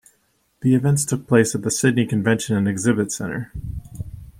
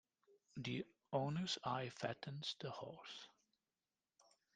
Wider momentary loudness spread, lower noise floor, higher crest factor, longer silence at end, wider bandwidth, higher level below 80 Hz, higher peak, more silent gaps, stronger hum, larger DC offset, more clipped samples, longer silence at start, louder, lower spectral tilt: about the same, 15 LU vs 13 LU; second, -65 dBFS vs under -90 dBFS; about the same, 18 dB vs 22 dB; second, 0.1 s vs 0.35 s; first, 16 kHz vs 9.6 kHz; first, -44 dBFS vs -82 dBFS; first, -2 dBFS vs -26 dBFS; neither; neither; neither; neither; first, 0.6 s vs 0.3 s; first, -20 LUFS vs -46 LUFS; about the same, -5.5 dB/octave vs -5 dB/octave